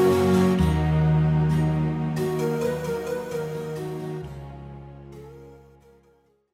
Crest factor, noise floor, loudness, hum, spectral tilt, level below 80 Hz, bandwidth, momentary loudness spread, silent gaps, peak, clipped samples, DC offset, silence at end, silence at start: 16 dB; -62 dBFS; -24 LUFS; none; -7.5 dB/octave; -38 dBFS; 15.5 kHz; 22 LU; none; -10 dBFS; under 0.1%; under 0.1%; 1 s; 0 s